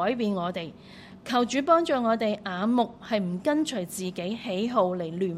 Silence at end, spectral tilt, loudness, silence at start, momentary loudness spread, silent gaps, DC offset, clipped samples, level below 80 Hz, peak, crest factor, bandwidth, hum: 0 s; -5.5 dB/octave; -27 LUFS; 0 s; 11 LU; none; under 0.1%; under 0.1%; -64 dBFS; -8 dBFS; 18 dB; 15.5 kHz; none